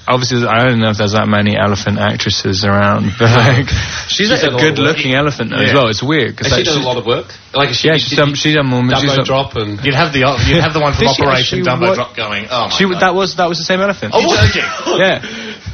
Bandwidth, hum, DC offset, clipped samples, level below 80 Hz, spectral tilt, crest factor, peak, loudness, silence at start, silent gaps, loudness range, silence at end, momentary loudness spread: 6.8 kHz; none; under 0.1%; under 0.1%; -34 dBFS; -5 dB/octave; 12 dB; 0 dBFS; -12 LUFS; 0.05 s; none; 1 LU; 0 s; 6 LU